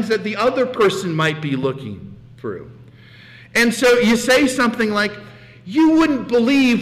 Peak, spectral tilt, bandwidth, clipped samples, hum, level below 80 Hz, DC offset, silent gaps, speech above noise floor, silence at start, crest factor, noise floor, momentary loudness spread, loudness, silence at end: -8 dBFS; -4.5 dB/octave; 16 kHz; under 0.1%; none; -50 dBFS; under 0.1%; none; 26 dB; 0 s; 10 dB; -43 dBFS; 16 LU; -17 LUFS; 0 s